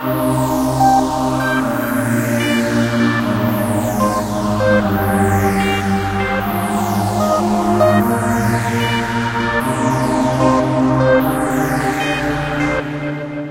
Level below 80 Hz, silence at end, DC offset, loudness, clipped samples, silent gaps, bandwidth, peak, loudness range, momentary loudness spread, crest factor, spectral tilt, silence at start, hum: -36 dBFS; 0 s; under 0.1%; -16 LUFS; under 0.1%; none; 16.5 kHz; -2 dBFS; 1 LU; 5 LU; 14 dB; -6 dB/octave; 0 s; none